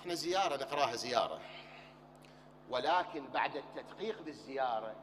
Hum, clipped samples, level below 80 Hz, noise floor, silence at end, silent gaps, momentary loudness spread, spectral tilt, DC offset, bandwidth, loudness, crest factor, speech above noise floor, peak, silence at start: none; under 0.1%; -74 dBFS; -58 dBFS; 0 s; none; 17 LU; -3 dB/octave; under 0.1%; 15.5 kHz; -36 LUFS; 24 dB; 21 dB; -14 dBFS; 0 s